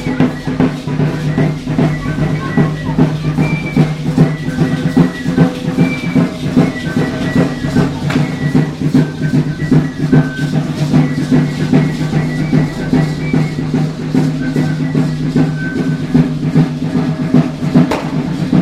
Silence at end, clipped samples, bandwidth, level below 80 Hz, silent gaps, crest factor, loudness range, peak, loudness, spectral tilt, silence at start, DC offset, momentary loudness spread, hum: 0 s; under 0.1%; 11.5 kHz; -36 dBFS; none; 14 dB; 2 LU; 0 dBFS; -14 LUFS; -7.5 dB/octave; 0 s; under 0.1%; 3 LU; none